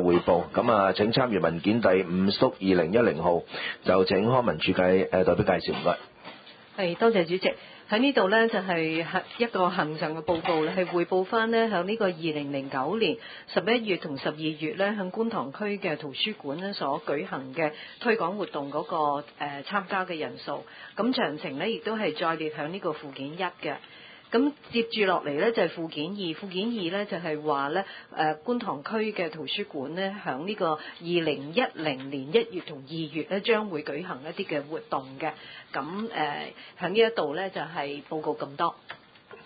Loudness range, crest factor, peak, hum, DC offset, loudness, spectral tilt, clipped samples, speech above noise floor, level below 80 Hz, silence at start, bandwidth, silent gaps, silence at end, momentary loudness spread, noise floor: 6 LU; 20 dB; -6 dBFS; none; under 0.1%; -28 LUFS; -10 dB/octave; under 0.1%; 20 dB; -60 dBFS; 0 s; 5 kHz; none; 0.05 s; 11 LU; -48 dBFS